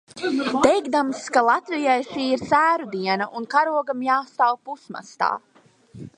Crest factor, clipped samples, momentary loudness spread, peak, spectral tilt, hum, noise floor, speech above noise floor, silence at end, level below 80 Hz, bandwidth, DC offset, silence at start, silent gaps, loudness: 20 dB; under 0.1%; 10 LU; -2 dBFS; -4 dB/octave; none; -46 dBFS; 25 dB; 0.1 s; -62 dBFS; 11.5 kHz; under 0.1%; 0.15 s; none; -22 LUFS